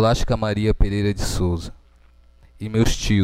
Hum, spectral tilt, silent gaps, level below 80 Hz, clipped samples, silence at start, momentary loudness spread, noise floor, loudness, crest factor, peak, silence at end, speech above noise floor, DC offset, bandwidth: none; -5.5 dB/octave; none; -26 dBFS; under 0.1%; 0 s; 9 LU; -51 dBFS; -22 LUFS; 18 dB; -4 dBFS; 0 s; 32 dB; under 0.1%; 15.5 kHz